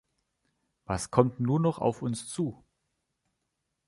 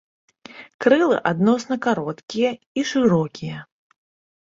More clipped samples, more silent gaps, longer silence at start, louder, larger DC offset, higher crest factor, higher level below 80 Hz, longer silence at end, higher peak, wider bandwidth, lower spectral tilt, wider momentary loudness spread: neither; second, none vs 0.74-0.79 s, 2.23-2.28 s, 2.66-2.75 s; first, 0.9 s vs 0.5 s; second, -29 LUFS vs -21 LUFS; neither; first, 26 dB vs 20 dB; first, -56 dBFS vs -62 dBFS; first, 1.35 s vs 0.8 s; second, -6 dBFS vs -2 dBFS; first, 11.5 kHz vs 7.8 kHz; about the same, -6.5 dB/octave vs -6 dB/octave; second, 9 LU vs 15 LU